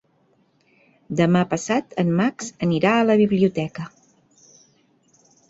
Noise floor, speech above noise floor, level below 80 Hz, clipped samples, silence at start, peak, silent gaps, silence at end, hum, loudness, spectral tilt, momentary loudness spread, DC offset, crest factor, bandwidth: -62 dBFS; 43 dB; -60 dBFS; under 0.1%; 1.1 s; -4 dBFS; none; 1.65 s; none; -20 LUFS; -6.5 dB/octave; 12 LU; under 0.1%; 18 dB; 8 kHz